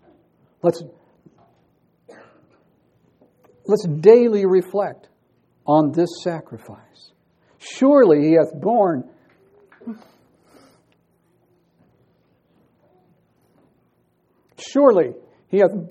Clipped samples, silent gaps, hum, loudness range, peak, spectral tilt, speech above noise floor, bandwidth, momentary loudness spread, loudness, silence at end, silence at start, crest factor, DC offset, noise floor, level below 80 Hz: under 0.1%; none; none; 12 LU; 0 dBFS; -7.5 dB/octave; 47 dB; 9.2 kHz; 24 LU; -17 LUFS; 0 s; 0.65 s; 22 dB; under 0.1%; -64 dBFS; -72 dBFS